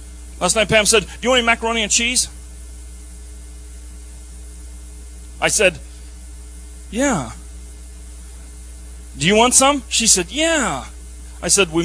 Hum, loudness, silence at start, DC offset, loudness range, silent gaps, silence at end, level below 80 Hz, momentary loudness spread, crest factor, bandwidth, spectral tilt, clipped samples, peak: none; -16 LUFS; 0 s; under 0.1%; 11 LU; none; 0 s; -36 dBFS; 24 LU; 20 dB; 11 kHz; -2 dB/octave; under 0.1%; 0 dBFS